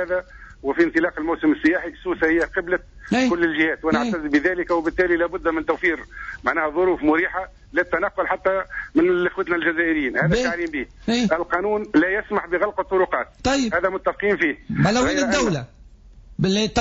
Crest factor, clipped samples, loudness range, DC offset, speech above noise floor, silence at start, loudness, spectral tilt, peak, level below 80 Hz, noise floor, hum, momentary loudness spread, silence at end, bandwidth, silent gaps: 14 dB; under 0.1%; 1 LU; under 0.1%; 25 dB; 0 s; -21 LUFS; -4 dB/octave; -8 dBFS; -44 dBFS; -46 dBFS; none; 7 LU; 0 s; 8 kHz; none